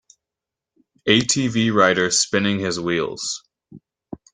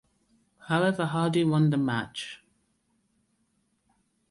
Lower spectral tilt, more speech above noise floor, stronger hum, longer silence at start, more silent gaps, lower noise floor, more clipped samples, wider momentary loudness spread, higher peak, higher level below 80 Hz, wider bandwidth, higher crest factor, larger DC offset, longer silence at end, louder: second, -3 dB/octave vs -6.5 dB/octave; first, 67 dB vs 47 dB; neither; first, 1.05 s vs 0.65 s; neither; first, -87 dBFS vs -73 dBFS; neither; about the same, 13 LU vs 14 LU; first, -2 dBFS vs -14 dBFS; first, -58 dBFS vs -66 dBFS; second, 10 kHz vs 11.5 kHz; about the same, 20 dB vs 16 dB; neither; second, 0.2 s vs 1.95 s; first, -19 LUFS vs -26 LUFS